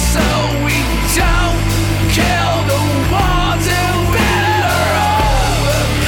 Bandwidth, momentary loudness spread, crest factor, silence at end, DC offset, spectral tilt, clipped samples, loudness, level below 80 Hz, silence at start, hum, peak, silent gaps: 17.5 kHz; 2 LU; 10 dB; 0 s; under 0.1%; -4.5 dB/octave; under 0.1%; -14 LUFS; -20 dBFS; 0 s; none; -4 dBFS; none